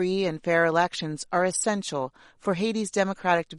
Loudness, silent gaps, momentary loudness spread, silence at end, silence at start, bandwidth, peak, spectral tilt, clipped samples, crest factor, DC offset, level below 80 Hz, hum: -26 LUFS; none; 9 LU; 0 s; 0 s; 11.5 kHz; -8 dBFS; -4 dB/octave; under 0.1%; 18 dB; under 0.1%; -64 dBFS; none